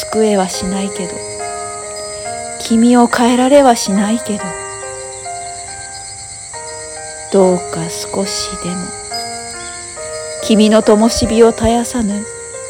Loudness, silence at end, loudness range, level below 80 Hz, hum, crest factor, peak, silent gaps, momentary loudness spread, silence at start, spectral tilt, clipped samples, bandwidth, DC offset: -15 LUFS; 0 s; 6 LU; -38 dBFS; none; 14 dB; 0 dBFS; none; 16 LU; 0 s; -4 dB/octave; 0.1%; 17 kHz; under 0.1%